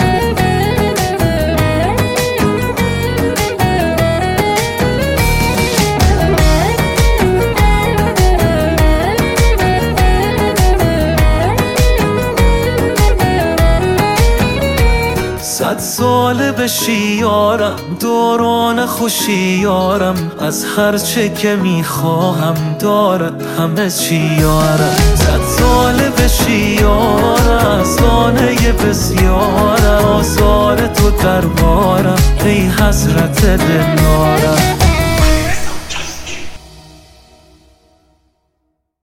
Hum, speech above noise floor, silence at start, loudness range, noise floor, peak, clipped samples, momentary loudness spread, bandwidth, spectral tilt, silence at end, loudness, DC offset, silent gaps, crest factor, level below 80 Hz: none; 55 dB; 0 s; 3 LU; -67 dBFS; 0 dBFS; under 0.1%; 4 LU; 17 kHz; -5 dB/octave; 2.35 s; -12 LUFS; under 0.1%; none; 12 dB; -18 dBFS